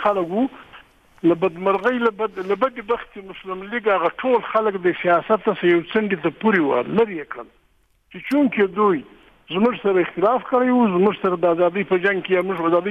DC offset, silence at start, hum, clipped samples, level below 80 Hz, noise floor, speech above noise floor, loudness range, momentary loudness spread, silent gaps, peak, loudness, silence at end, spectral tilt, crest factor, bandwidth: under 0.1%; 0 s; none; under 0.1%; -58 dBFS; -61 dBFS; 41 dB; 3 LU; 8 LU; none; -6 dBFS; -20 LUFS; 0 s; -8 dB/octave; 14 dB; 5.8 kHz